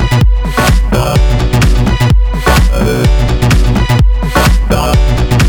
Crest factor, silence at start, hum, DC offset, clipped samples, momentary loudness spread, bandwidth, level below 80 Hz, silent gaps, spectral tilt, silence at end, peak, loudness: 8 dB; 0 s; none; under 0.1%; under 0.1%; 1 LU; 19.5 kHz; -10 dBFS; none; -5.5 dB/octave; 0 s; 0 dBFS; -10 LUFS